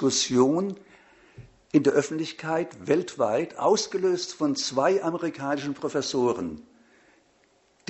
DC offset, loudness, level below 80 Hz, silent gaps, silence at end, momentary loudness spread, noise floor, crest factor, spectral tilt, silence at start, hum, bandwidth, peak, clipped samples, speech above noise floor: under 0.1%; -26 LUFS; -64 dBFS; none; 1.25 s; 9 LU; -64 dBFS; 20 dB; -4 dB/octave; 0 s; none; 8.2 kHz; -6 dBFS; under 0.1%; 39 dB